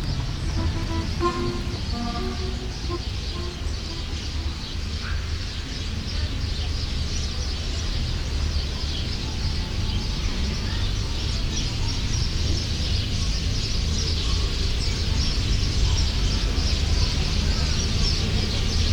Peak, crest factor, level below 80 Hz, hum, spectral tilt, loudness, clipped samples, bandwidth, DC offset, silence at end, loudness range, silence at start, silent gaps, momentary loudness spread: -8 dBFS; 16 dB; -26 dBFS; none; -4.5 dB/octave; -26 LUFS; under 0.1%; 12.5 kHz; under 0.1%; 0 s; 6 LU; 0 s; none; 6 LU